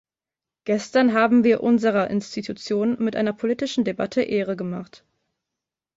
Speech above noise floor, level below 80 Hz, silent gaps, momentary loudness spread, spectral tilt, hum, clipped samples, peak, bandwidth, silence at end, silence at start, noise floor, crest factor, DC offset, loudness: 68 dB; -64 dBFS; none; 13 LU; -6 dB/octave; none; under 0.1%; -6 dBFS; 7.8 kHz; 1.1 s; 0.65 s; -89 dBFS; 16 dB; under 0.1%; -22 LUFS